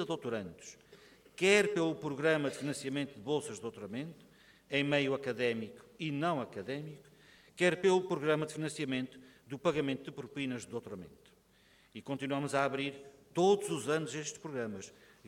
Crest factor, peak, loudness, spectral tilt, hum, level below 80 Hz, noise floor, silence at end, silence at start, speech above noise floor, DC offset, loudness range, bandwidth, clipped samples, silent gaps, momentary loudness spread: 22 dB; -14 dBFS; -34 LUFS; -4.5 dB/octave; none; -74 dBFS; -66 dBFS; 0 s; 0 s; 32 dB; under 0.1%; 6 LU; 15.5 kHz; under 0.1%; none; 18 LU